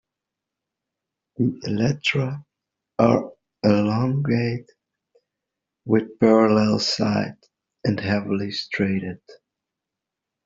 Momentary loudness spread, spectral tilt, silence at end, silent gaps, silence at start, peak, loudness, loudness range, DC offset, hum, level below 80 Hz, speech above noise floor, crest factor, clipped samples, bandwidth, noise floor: 15 LU; -5.5 dB/octave; 1.1 s; none; 1.4 s; -2 dBFS; -22 LUFS; 4 LU; under 0.1%; none; -58 dBFS; 64 dB; 20 dB; under 0.1%; 7.8 kHz; -85 dBFS